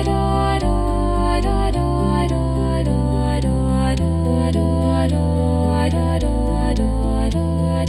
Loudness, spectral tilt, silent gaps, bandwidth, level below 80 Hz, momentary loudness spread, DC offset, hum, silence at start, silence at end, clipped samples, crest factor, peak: -19 LUFS; -7.5 dB/octave; none; 12.5 kHz; -22 dBFS; 2 LU; under 0.1%; none; 0 s; 0 s; under 0.1%; 12 dB; -6 dBFS